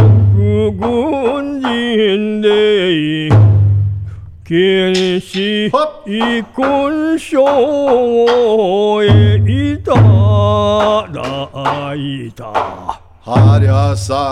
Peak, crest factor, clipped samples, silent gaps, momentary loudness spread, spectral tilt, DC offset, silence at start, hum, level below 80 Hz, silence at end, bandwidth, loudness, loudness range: 0 dBFS; 12 dB; under 0.1%; none; 11 LU; -7 dB/octave; under 0.1%; 0 s; none; -34 dBFS; 0 s; 10 kHz; -13 LUFS; 4 LU